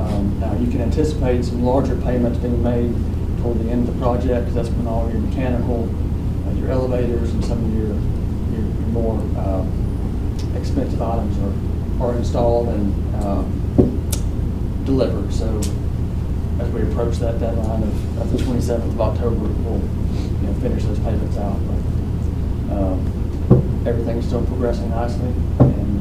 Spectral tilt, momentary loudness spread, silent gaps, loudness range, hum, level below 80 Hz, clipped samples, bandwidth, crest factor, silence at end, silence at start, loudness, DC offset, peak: -8.5 dB/octave; 5 LU; none; 2 LU; none; -24 dBFS; under 0.1%; 13.5 kHz; 18 dB; 0 s; 0 s; -21 LUFS; 0.9%; 0 dBFS